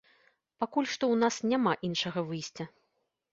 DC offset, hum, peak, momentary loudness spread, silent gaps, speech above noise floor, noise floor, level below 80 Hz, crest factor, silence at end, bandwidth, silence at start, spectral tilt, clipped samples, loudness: under 0.1%; none; -12 dBFS; 12 LU; none; 48 dB; -79 dBFS; -72 dBFS; 20 dB; 0.65 s; 8 kHz; 0.6 s; -4.5 dB/octave; under 0.1%; -30 LUFS